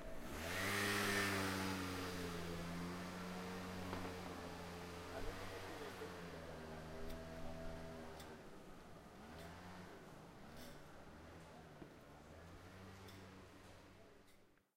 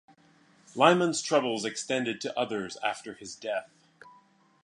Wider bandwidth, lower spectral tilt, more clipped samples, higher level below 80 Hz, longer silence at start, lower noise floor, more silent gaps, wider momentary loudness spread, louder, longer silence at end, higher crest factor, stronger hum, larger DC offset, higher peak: first, 16 kHz vs 11 kHz; about the same, -4 dB/octave vs -3.5 dB/octave; neither; first, -62 dBFS vs -76 dBFS; second, 0 s vs 0.75 s; first, -69 dBFS vs -62 dBFS; neither; first, 19 LU vs 16 LU; second, -47 LUFS vs -28 LUFS; second, 0.2 s vs 0.55 s; second, 20 dB vs 26 dB; neither; neither; second, -28 dBFS vs -4 dBFS